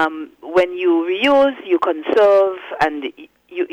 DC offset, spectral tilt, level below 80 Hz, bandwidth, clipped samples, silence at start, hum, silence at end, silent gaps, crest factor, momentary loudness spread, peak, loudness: under 0.1%; -5 dB/octave; -56 dBFS; 10 kHz; under 0.1%; 0 s; none; 0.05 s; none; 12 dB; 15 LU; -6 dBFS; -16 LUFS